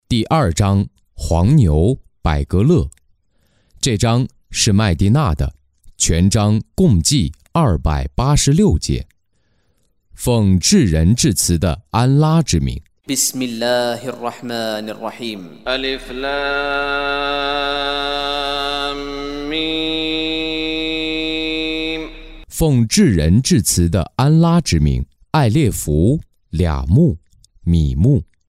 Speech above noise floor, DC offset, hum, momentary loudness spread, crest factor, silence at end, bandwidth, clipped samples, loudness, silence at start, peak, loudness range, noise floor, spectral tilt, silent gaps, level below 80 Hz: 49 dB; under 0.1%; none; 11 LU; 14 dB; 0.25 s; 16 kHz; under 0.1%; -17 LUFS; 0.1 s; -2 dBFS; 5 LU; -64 dBFS; -5 dB/octave; none; -28 dBFS